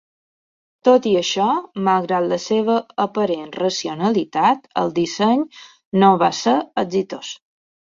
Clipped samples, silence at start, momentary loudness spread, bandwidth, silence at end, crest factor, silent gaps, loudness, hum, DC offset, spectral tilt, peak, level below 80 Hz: under 0.1%; 0.85 s; 8 LU; 7.6 kHz; 0.45 s; 18 dB; 5.85-5.91 s; -19 LUFS; none; under 0.1%; -5 dB/octave; -2 dBFS; -64 dBFS